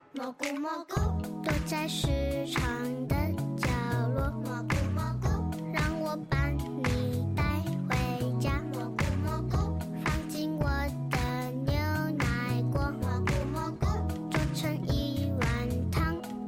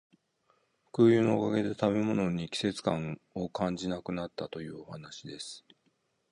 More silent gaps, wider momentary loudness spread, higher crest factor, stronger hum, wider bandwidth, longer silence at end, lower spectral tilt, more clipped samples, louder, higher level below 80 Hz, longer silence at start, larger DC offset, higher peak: neither; second, 3 LU vs 18 LU; second, 14 dB vs 20 dB; neither; first, 16.5 kHz vs 11 kHz; second, 0 s vs 0.75 s; about the same, -6 dB/octave vs -6.5 dB/octave; neither; about the same, -31 LUFS vs -30 LUFS; first, -38 dBFS vs -62 dBFS; second, 0.15 s vs 0.95 s; neither; second, -16 dBFS vs -12 dBFS